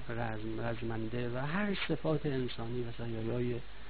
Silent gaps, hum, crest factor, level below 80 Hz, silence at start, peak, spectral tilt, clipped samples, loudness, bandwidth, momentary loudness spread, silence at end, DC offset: none; none; 16 dB; -52 dBFS; 0 s; -20 dBFS; -5.5 dB/octave; under 0.1%; -37 LUFS; 4.8 kHz; 6 LU; 0 s; 1%